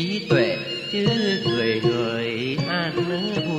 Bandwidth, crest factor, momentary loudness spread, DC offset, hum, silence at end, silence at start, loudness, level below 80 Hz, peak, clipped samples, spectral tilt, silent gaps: 11 kHz; 18 dB; 5 LU; under 0.1%; none; 0 s; 0 s; -22 LUFS; -58 dBFS; -6 dBFS; under 0.1%; -6 dB/octave; none